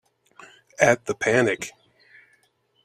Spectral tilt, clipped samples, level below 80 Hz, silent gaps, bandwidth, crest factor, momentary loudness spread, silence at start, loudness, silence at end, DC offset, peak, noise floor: -4.5 dB/octave; under 0.1%; -64 dBFS; none; 14.5 kHz; 24 dB; 16 LU; 0.8 s; -22 LUFS; 1.15 s; under 0.1%; -2 dBFS; -66 dBFS